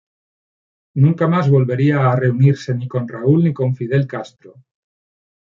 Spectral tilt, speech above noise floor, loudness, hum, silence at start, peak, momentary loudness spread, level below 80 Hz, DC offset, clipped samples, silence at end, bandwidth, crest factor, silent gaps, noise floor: -9 dB/octave; over 74 dB; -16 LUFS; none; 0.95 s; -2 dBFS; 10 LU; -60 dBFS; under 0.1%; under 0.1%; 0.95 s; 7.2 kHz; 14 dB; none; under -90 dBFS